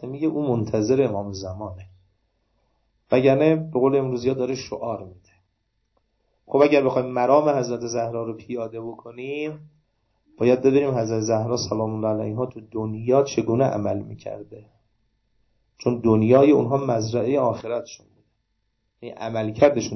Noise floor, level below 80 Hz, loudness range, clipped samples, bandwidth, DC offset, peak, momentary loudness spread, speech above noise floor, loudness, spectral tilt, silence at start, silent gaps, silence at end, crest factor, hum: -72 dBFS; -56 dBFS; 4 LU; under 0.1%; 6.2 kHz; under 0.1%; -4 dBFS; 16 LU; 51 dB; -22 LUFS; -6.5 dB/octave; 0 s; none; 0 s; 18 dB; none